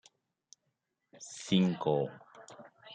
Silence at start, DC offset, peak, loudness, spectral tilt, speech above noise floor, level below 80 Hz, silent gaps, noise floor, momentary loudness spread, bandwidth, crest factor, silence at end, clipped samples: 1.2 s; under 0.1%; -16 dBFS; -32 LUFS; -6 dB/octave; 52 dB; -78 dBFS; none; -83 dBFS; 24 LU; 9.2 kHz; 20 dB; 0 s; under 0.1%